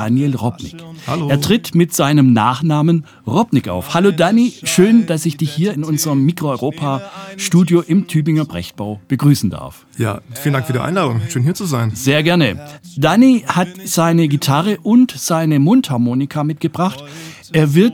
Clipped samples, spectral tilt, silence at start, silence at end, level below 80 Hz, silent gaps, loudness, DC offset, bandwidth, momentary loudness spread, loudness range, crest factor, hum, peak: under 0.1%; -6 dB/octave; 0 s; 0 s; -54 dBFS; none; -15 LUFS; under 0.1%; 19.5 kHz; 11 LU; 4 LU; 14 dB; none; 0 dBFS